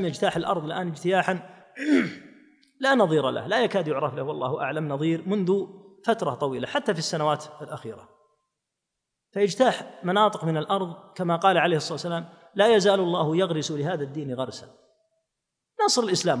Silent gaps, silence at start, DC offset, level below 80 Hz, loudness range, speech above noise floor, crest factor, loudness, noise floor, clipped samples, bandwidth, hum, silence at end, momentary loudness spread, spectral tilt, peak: none; 0 s; under 0.1%; -70 dBFS; 5 LU; 59 dB; 20 dB; -25 LUFS; -84 dBFS; under 0.1%; 10.5 kHz; none; 0 s; 13 LU; -5 dB/octave; -6 dBFS